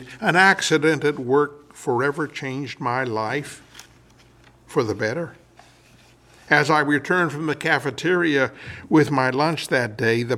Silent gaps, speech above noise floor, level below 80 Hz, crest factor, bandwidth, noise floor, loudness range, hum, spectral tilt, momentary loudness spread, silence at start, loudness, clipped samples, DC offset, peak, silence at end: none; 31 dB; -62 dBFS; 20 dB; 15 kHz; -52 dBFS; 7 LU; none; -5 dB/octave; 12 LU; 0 s; -21 LUFS; under 0.1%; under 0.1%; -2 dBFS; 0 s